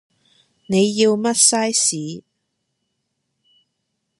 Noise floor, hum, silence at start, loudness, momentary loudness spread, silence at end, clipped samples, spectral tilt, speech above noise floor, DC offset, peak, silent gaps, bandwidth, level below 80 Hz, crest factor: -75 dBFS; none; 0.7 s; -16 LUFS; 16 LU; 2 s; under 0.1%; -3 dB/octave; 57 dB; under 0.1%; -2 dBFS; none; 11.5 kHz; -66 dBFS; 20 dB